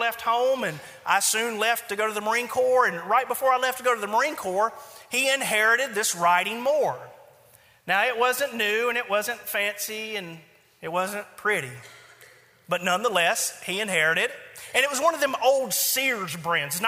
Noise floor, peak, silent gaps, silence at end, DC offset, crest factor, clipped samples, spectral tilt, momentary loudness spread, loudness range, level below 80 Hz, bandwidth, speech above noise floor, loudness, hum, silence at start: -56 dBFS; -4 dBFS; none; 0 s; under 0.1%; 22 dB; under 0.1%; -1.5 dB/octave; 9 LU; 5 LU; -74 dBFS; 16 kHz; 31 dB; -24 LUFS; none; 0 s